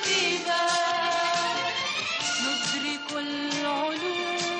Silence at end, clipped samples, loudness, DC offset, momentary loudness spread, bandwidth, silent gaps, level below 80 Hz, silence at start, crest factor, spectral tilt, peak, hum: 0 s; under 0.1%; -26 LUFS; under 0.1%; 5 LU; 9.6 kHz; none; -72 dBFS; 0 s; 14 dB; -1.5 dB/octave; -14 dBFS; none